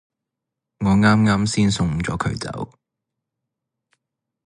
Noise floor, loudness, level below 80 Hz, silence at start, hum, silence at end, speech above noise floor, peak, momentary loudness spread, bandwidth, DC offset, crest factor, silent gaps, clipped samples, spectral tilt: -83 dBFS; -19 LUFS; -42 dBFS; 0.8 s; none; 1.8 s; 65 dB; -4 dBFS; 14 LU; 11 kHz; under 0.1%; 18 dB; none; under 0.1%; -5.5 dB/octave